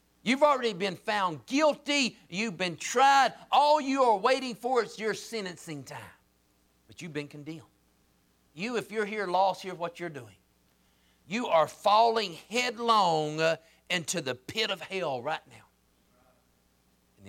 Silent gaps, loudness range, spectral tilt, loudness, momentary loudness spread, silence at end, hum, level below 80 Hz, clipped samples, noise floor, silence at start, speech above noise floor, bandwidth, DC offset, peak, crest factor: none; 12 LU; -3.5 dB/octave; -28 LUFS; 16 LU; 0 s; none; -74 dBFS; under 0.1%; -68 dBFS; 0.25 s; 40 dB; 16.5 kHz; under 0.1%; -12 dBFS; 18 dB